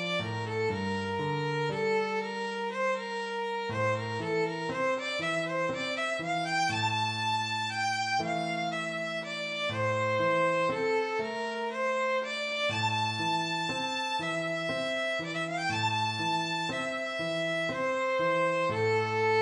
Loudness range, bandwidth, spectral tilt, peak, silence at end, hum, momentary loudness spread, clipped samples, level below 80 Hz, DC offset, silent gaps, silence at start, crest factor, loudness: 2 LU; 11 kHz; -4.5 dB/octave; -18 dBFS; 0 s; none; 5 LU; under 0.1%; -70 dBFS; under 0.1%; none; 0 s; 14 dB; -30 LUFS